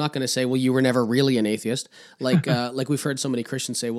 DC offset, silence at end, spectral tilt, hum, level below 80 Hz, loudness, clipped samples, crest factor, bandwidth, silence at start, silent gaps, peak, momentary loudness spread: under 0.1%; 0 s; -5 dB/octave; none; -74 dBFS; -23 LUFS; under 0.1%; 16 dB; 15 kHz; 0 s; none; -6 dBFS; 7 LU